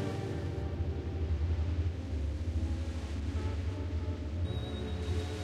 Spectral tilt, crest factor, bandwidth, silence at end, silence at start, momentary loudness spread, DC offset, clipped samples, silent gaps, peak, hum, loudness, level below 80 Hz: -7.5 dB/octave; 12 dB; 9.6 kHz; 0 s; 0 s; 4 LU; under 0.1%; under 0.1%; none; -22 dBFS; none; -36 LUFS; -38 dBFS